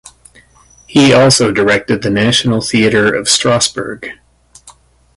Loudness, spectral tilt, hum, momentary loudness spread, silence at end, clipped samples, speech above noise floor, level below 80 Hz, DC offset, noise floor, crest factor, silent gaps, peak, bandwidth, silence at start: -11 LUFS; -4 dB/octave; none; 12 LU; 0.45 s; under 0.1%; 35 dB; -44 dBFS; under 0.1%; -46 dBFS; 14 dB; none; 0 dBFS; 11.5 kHz; 0.9 s